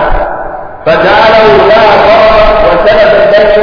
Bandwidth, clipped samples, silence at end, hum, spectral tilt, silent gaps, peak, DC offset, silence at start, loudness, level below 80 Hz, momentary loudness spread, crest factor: 5.4 kHz; 9%; 0 s; none; -6 dB/octave; none; 0 dBFS; under 0.1%; 0 s; -4 LUFS; -20 dBFS; 11 LU; 4 dB